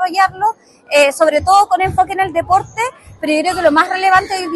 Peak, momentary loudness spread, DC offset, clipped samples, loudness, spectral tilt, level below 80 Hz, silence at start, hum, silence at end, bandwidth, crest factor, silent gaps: 0 dBFS; 8 LU; under 0.1%; under 0.1%; -14 LUFS; -3.5 dB/octave; -44 dBFS; 0 s; none; 0 s; 12.5 kHz; 14 dB; none